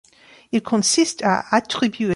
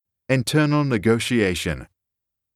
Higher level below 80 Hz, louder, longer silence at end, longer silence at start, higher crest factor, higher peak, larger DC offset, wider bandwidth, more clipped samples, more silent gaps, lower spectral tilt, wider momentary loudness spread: second, -62 dBFS vs -46 dBFS; about the same, -19 LUFS vs -21 LUFS; second, 0 s vs 0.7 s; first, 0.55 s vs 0.3 s; about the same, 18 dB vs 16 dB; first, -2 dBFS vs -6 dBFS; neither; second, 11.5 kHz vs 15 kHz; neither; neither; second, -3.5 dB/octave vs -5.5 dB/octave; about the same, 7 LU vs 8 LU